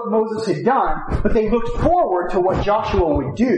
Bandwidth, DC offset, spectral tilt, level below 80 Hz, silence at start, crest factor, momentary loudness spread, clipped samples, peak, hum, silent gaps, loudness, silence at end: 9.6 kHz; under 0.1%; -7.5 dB/octave; -28 dBFS; 0 s; 14 dB; 3 LU; under 0.1%; -4 dBFS; none; none; -19 LUFS; 0 s